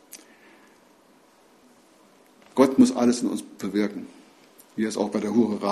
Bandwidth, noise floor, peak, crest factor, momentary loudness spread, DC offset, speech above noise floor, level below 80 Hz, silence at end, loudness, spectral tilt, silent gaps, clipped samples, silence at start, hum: 14 kHz; -57 dBFS; -4 dBFS; 22 dB; 21 LU; under 0.1%; 34 dB; -66 dBFS; 0 s; -23 LUFS; -5.5 dB/octave; none; under 0.1%; 0.15 s; none